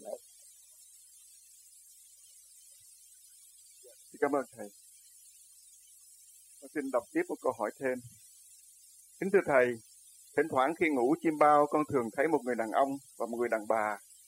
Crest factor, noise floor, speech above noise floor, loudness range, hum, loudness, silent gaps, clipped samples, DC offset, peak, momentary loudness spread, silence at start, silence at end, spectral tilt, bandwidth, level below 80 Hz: 22 dB; -58 dBFS; 28 dB; 12 LU; none; -31 LUFS; none; under 0.1%; under 0.1%; -10 dBFS; 19 LU; 0 s; 0.3 s; -5.5 dB/octave; 16 kHz; -78 dBFS